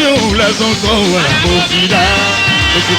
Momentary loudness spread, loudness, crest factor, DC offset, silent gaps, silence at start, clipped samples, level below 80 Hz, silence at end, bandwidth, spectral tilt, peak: 2 LU; -10 LUFS; 12 dB; under 0.1%; none; 0 s; under 0.1%; -28 dBFS; 0 s; 19.5 kHz; -3.5 dB/octave; 0 dBFS